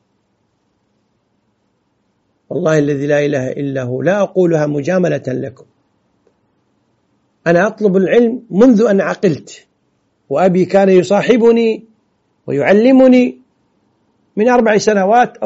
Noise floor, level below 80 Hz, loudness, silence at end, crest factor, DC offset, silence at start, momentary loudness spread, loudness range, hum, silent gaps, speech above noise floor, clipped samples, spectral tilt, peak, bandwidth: -63 dBFS; -56 dBFS; -13 LUFS; 0 s; 14 dB; under 0.1%; 2.5 s; 11 LU; 7 LU; none; none; 51 dB; under 0.1%; -6 dB/octave; 0 dBFS; 8 kHz